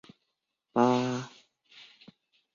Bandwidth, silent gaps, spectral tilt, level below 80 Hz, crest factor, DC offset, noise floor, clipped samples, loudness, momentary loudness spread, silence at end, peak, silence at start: 7.4 kHz; none; -6 dB/octave; -76 dBFS; 22 dB; under 0.1%; -83 dBFS; under 0.1%; -28 LUFS; 22 LU; 1.25 s; -10 dBFS; 0.75 s